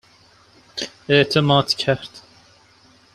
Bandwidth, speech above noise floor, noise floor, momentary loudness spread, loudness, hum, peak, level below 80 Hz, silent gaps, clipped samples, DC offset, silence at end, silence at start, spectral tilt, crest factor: 13 kHz; 35 dB; -53 dBFS; 16 LU; -19 LUFS; none; -2 dBFS; -56 dBFS; none; under 0.1%; under 0.1%; 0.95 s; 0.75 s; -5 dB/octave; 20 dB